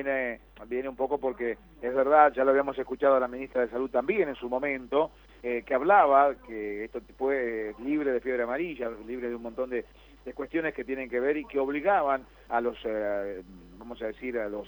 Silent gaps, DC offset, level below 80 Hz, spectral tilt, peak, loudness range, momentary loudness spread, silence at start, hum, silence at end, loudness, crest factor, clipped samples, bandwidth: none; under 0.1%; -56 dBFS; -7.5 dB/octave; -6 dBFS; 6 LU; 14 LU; 0 s; none; 0 s; -28 LUFS; 22 dB; under 0.1%; 19.5 kHz